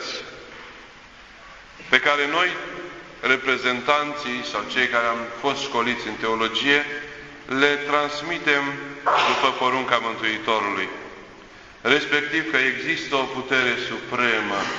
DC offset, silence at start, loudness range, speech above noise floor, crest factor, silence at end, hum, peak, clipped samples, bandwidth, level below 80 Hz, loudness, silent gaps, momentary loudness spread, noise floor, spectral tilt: under 0.1%; 0 s; 2 LU; 23 dB; 22 dB; 0 s; none; 0 dBFS; under 0.1%; 8 kHz; -58 dBFS; -22 LUFS; none; 15 LU; -45 dBFS; -3 dB/octave